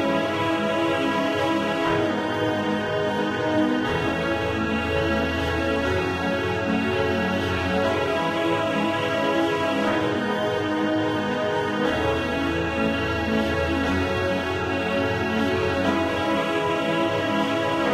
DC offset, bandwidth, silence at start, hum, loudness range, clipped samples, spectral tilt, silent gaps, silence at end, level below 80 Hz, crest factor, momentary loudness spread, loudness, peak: under 0.1%; 15 kHz; 0 s; none; 1 LU; under 0.1%; -5.5 dB/octave; none; 0 s; -44 dBFS; 14 dB; 2 LU; -23 LUFS; -10 dBFS